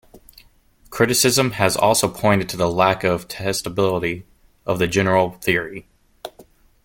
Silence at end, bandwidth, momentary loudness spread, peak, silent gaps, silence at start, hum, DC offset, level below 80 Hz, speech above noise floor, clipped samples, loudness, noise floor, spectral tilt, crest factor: 0.45 s; 17 kHz; 19 LU; 0 dBFS; none; 0.15 s; none; under 0.1%; -50 dBFS; 35 dB; under 0.1%; -19 LUFS; -53 dBFS; -4 dB/octave; 20 dB